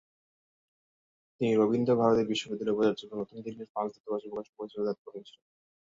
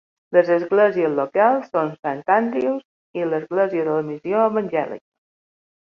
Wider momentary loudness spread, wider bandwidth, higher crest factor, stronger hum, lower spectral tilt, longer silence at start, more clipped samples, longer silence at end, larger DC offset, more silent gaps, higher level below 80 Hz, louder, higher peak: first, 16 LU vs 9 LU; first, 7.8 kHz vs 6.6 kHz; about the same, 20 dB vs 16 dB; neither; second, -6.5 dB/octave vs -8.5 dB/octave; first, 1.4 s vs 0.3 s; neither; second, 0.55 s vs 1 s; neither; second, 3.69-3.75 s, 4.00-4.04 s, 4.49-4.53 s, 4.98-5.05 s vs 1.99-2.03 s, 2.85-3.14 s; about the same, -70 dBFS vs -70 dBFS; second, -30 LUFS vs -20 LUFS; second, -12 dBFS vs -4 dBFS